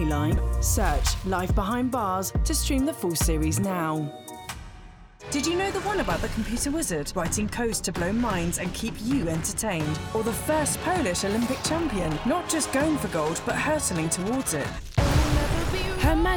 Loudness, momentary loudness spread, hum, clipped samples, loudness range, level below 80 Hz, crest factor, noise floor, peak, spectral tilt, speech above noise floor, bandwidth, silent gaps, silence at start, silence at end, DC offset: -26 LUFS; 5 LU; none; under 0.1%; 3 LU; -32 dBFS; 18 dB; -46 dBFS; -8 dBFS; -4.5 dB/octave; 20 dB; over 20 kHz; none; 0 s; 0 s; under 0.1%